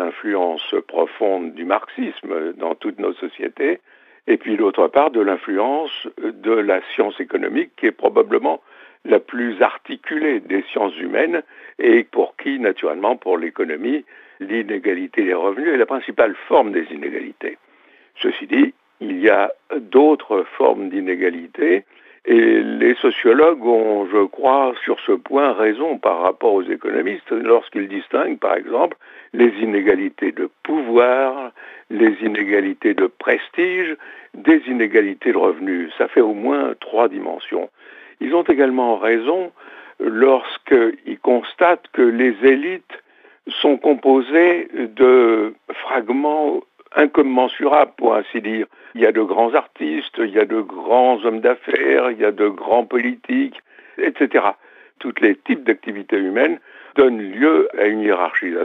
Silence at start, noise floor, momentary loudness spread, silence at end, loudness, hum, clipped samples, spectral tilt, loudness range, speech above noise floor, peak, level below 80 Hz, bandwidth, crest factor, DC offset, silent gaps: 0 s; -53 dBFS; 11 LU; 0 s; -18 LUFS; none; under 0.1%; -7 dB/octave; 4 LU; 35 dB; -2 dBFS; -68 dBFS; 4.1 kHz; 16 dB; under 0.1%; none